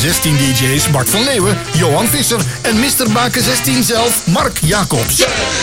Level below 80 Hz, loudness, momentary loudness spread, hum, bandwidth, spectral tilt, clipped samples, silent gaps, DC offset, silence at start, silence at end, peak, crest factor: -34 dBFS; -12 LUFS; 2 LU; none; 17 kHz; -3.5 dB/octave; under 0.1%; none; 0.5%; 0 s; 0 s; 0 dBFS; 12 dB